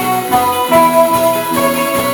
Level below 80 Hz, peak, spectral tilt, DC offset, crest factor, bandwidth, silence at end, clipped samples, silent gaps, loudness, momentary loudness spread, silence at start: -46 dBFS; 0 dBFS; -3.5 dB/octave; under 0.1%; 12 dB; 19.5 kHz; 0 s; under 0.1%; none; -12 LUFS; 4 LU; 0 s